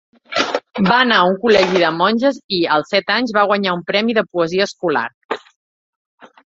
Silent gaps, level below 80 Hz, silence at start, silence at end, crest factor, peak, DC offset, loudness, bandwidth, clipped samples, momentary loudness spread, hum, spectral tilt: 2.44-2.49 s, 5.14-5.29 s, 5.56-6.18 s; -58 dBFS; 0.3 s; 0.3 s; 16 dB; 0 dBFS; under 0.1%; -16 LUFS; 7.8 kHz; under 0.1%; 8 LU; none; -5 dB/octave